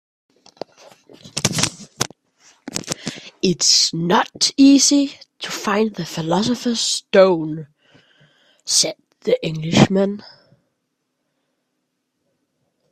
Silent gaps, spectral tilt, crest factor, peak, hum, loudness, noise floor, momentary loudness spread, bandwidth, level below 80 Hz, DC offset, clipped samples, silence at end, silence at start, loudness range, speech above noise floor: none; -3.5 dB/octave; 20 dB; 0 dBFS; none; -17 LUFS; -74 dBFS; 18 LU; 15 kHz; -58 dBFS; under 0.1%; under 0.1%; 2.7 s; 1.25 s; 7 LU; 57 dB